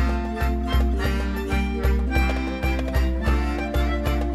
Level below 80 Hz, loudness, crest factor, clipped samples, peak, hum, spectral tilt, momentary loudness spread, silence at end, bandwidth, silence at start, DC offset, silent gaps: -24 dBFS; -24 LUFS; 14 dB; under 0.1%; -8 dBFS; none; -7 dB/octave; 3 LU; 0 s; 12.5 kHz; 0 s; under 0.1%; none